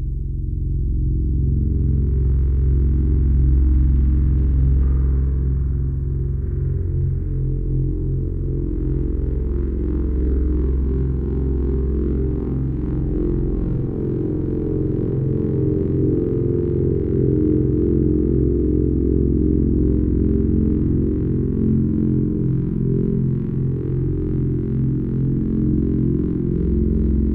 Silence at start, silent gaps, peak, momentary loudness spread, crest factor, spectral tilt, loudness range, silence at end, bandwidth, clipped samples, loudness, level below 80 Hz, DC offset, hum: 0 s; none; -6 dBFS; 5 LU; 12 dB; -13.5 dB/octave; 4 LU; 0 s; 2.1 kHz; under 0.1%; -20 LUFS; -22 dBFS; under 0.1%; none